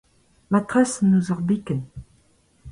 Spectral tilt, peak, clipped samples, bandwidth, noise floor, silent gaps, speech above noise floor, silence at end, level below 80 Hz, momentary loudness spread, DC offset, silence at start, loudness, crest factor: -6.5 dB/octave; -4 dBFS; under 0.1%; 11 kHz; -60 dBFS; none; 40 dB; 0 s; -54 dBFS; 10 LU; under 0.1%; 0.5 s; -22 LUFS; 18 dB